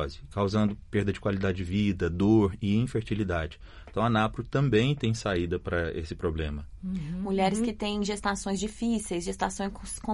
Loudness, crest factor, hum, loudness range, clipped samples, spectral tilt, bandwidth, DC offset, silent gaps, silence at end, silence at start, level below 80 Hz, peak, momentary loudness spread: -29 LUFS; 16 dB; none; 3 LU; under 0.1%; -6 dB/octave; 11.5 kHz; under 0.1%; none; 0 s; 0 s; -44 dBFS; -12 dBFS; 10 LU